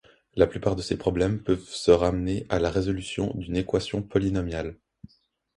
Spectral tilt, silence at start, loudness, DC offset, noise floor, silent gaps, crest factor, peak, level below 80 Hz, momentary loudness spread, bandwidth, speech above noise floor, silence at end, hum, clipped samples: -6.5 dB/octave; 0.35 s; -26 LUFS; under 0.1%; -61 dBFS; none; 20 dB; -6 dBFS; -42 dBFS; 8 LU; 11.5 kHz; 36 dB; 0.85 s; none; under 0.1%